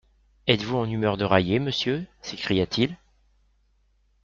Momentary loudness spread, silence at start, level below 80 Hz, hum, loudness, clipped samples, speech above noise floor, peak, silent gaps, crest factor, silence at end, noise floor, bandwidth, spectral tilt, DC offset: 10 LU; 0.45 s; -54 dBFS; none; -25 LUFS; under 0.1%; 41 dB; -2 dBFS; none; 24 dB; 1.3 s; -65 dBFS; 7.6 kHz; -6 dB/octave; under 0.1%